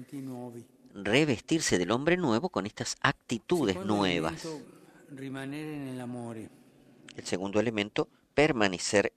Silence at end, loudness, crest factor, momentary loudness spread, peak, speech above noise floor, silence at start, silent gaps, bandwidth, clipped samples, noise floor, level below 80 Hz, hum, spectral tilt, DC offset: 0.1 s; -30 LUFS; 26 dB; 17 LU; -4 dBFS; 26 dB; 0 s; none; 15 kHz; under 0.1%; -56 dBFS; -60 dBFS; none; -4.5 dB/octave; under 0.1%